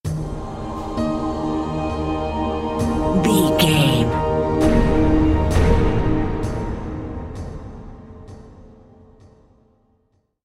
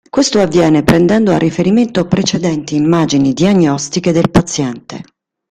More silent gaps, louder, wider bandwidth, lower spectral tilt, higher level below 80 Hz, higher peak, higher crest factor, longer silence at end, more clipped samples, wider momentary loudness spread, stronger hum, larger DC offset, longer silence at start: neither; second, -20 LUFS vs -12 LUFS; about the same, 16 kHz vs 15 kHz; about the same, -6 dB/octave vs -5.5 dB/octave; first, -28 dBFS vs -40 dBFS; about the same, -2 dBFS vs 0 dBFS; first, 18 dB vs 12 dB; first, 1.75 s vs 0.5 s; neither; first, 17 LU vs 8 LU; neither; neither; about the same, 0.05 s vs 0.15 s